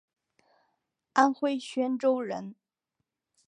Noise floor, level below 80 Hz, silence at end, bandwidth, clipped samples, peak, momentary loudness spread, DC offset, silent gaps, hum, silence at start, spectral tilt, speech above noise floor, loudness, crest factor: -84 dBFS; -84 dBFS; 0.95 s; 10.5 kHz; under 0.1%; -8 dBFS; 12 LU; under 0.1%; none; none; 1.15 s; -4.5 dB/octave; 57 dB; -28 LUFS; 22 dB